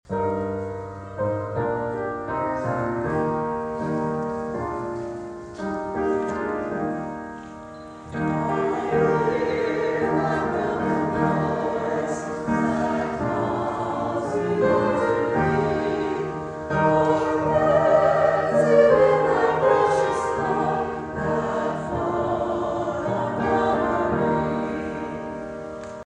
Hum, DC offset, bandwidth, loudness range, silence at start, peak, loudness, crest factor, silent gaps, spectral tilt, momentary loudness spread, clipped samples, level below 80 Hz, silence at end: none; under 0.1%; 10 kHz; 9 LU; 0.1 s; -4 dBFS; -23 LUFS; 18 dB; none; -7 dB/octave; 12 LU; under 0.1%; -48 dBFS; 0.1 s